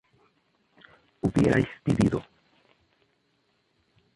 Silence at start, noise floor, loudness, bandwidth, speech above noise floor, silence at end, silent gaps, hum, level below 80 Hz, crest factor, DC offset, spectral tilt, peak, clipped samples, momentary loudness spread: 1.25 s; -71 dBFS; -26 LUFS; 11.5 kHz; 47 dB; 1.95 s; none; none; -50 dBFS; 20 dB; under 0.1%; -7.5 dB/octave; -10 dBFS; under 0.1%; 8 LU